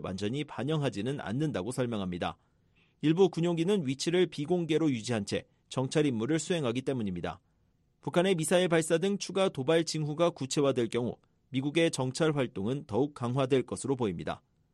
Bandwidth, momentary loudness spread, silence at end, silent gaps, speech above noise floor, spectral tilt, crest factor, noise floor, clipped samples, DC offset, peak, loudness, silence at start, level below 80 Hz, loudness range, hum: 12.5 kHz; 9 LU; 0.35 s; none; 41 dB; -5.5 dB/octave; 18 dB; -71 dBFS; under 0.1%; under 0.1%; -12 dBFS; -30 LUFS; 0 s; -66 dBFS; 3 LU; none